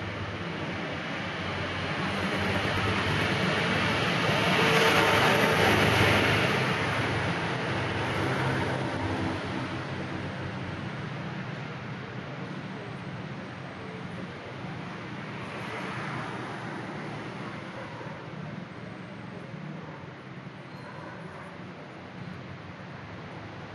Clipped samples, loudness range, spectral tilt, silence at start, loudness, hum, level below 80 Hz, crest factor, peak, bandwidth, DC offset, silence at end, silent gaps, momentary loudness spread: under 0.1%; 18 LU; -5 dB/octave; 0 s; -29 LUFS; none; -56 dBFS; 20 dB; -10 dBFS; 12.5 kHz; under 0.1%; 0 s; none; 19 LU